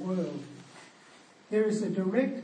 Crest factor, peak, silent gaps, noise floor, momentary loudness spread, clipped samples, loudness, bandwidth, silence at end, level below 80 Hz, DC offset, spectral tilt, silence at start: 20 dB; -12 dBFS; none; -56 dBFS; 22 LU; under 0.1%; -30 LUFS; 9.8 kHz; 0 s; -86 dBFS; under 0.1%; -7 dB/octave; 0 s